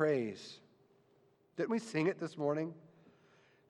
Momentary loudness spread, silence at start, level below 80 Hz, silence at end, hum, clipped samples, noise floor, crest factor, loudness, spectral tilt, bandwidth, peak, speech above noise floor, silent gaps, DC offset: 18 LU; 0 s; -88 dBFS; 0.85 s; none; under 0.1%; -70 dBFS; 20 dB; -37 LUFS; -6.5 dB/octave; 11 kHz; -20 dBFS; 34 dB; none; under 0.1%